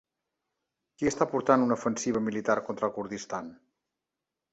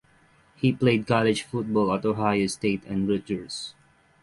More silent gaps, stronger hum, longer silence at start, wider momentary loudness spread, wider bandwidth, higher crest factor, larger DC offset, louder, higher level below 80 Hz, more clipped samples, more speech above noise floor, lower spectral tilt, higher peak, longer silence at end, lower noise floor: neither; neither; first, 1 s vs 0.6 s; first, 13 LU vs 10 LU; second, 8.2 kHz vs 11.5 kHz; about the same, 22 dB vs 18 dB; neither; second, -29 LUFS vs -25 LUFS; second, -66 dBFS vs -56 dBFS; neither; first, 60 dB vs 35 dB; about the same, -5 dB/octave vs -6 dB/octave; about the same, -8 dBFS vs -8 dBFS; first, 1 s vs 0.5 s; first, -88 dBFS vs -59 dBFS